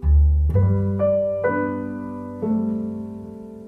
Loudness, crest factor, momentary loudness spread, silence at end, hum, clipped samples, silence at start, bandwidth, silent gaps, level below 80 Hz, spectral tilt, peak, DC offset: -22 LUFS; 12 dB; 14 LU; 0 s; none; under 0.1%; 0 s; 2.5 kHz; none; -24 dBFS; -11.5 dB/octave; -8 dBFS; under 0.1%